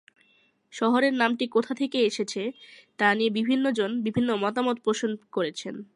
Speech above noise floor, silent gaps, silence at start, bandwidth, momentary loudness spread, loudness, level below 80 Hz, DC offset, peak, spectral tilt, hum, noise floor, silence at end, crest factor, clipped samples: 39 dB; none; 0.75 s; 11 kHz; 9 LU; -26 LUFS; -70 dBFS; under 0.1%; -6 dBFS; -4.5 dB/octave; none; -65 dBFS; 0.1 s; 20 dB; under 0.1%